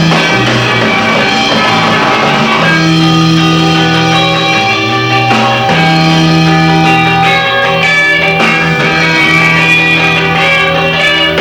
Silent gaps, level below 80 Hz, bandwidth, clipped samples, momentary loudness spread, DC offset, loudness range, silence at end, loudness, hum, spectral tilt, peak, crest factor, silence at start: none; -38 dBFS; 16 kHz; 0.2%; 3 LU; under 0.1%; 1 LU; 0 s; -7 LUFS; none; -4.5 dB/octave; 0 dBFS; 8 dB; 0 s